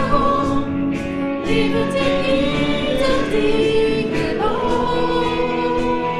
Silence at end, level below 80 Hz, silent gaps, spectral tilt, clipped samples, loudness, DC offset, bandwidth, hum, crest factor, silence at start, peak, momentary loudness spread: 0 s; -32 dBFS; none; -6 dB/octave; under 0.1%; -19 LUFS; under 0.1%; 12.5 kHz; none; 16 dB; 0 s; -2 dBFS; 4 LU